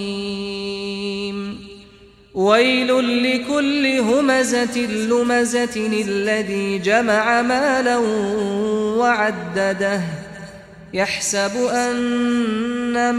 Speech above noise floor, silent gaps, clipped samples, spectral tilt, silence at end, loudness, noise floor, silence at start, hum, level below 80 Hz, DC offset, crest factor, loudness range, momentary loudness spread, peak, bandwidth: 28 dB; none; under 0.1%; -4 dB/octave; 0 s; -19 LUFS; -47 dBFS; 0 s; none; -54 dBFS; under 0.1%; 16 dB; 3 LU; 10 LU; -2 dBFS; 14.5 kHz